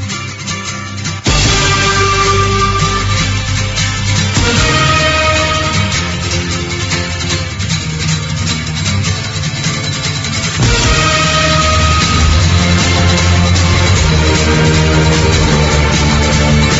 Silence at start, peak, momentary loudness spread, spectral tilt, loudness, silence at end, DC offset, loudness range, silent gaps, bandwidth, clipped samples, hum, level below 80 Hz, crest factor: 0 s; 0 dBFS; 6 LU; -4 dB/octave; -12 LUFS; 0 s; under 0.1%; 5 LU; none; 8 kHz; under 0.1%; none; -20 dBFS; 12 dB